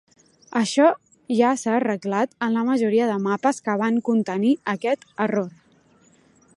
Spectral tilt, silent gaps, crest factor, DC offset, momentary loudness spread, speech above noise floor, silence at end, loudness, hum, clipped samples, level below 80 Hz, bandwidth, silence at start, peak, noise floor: -5.5 dB/octave; none; 18 dB; under 0.1%; 6 LU; 36 dB; 1.05 s; -22 LUFS; none; under 0.1%; -74 dBFS; 11.5 kHz; 0.5 s; -4 dBFS; -57 dBFS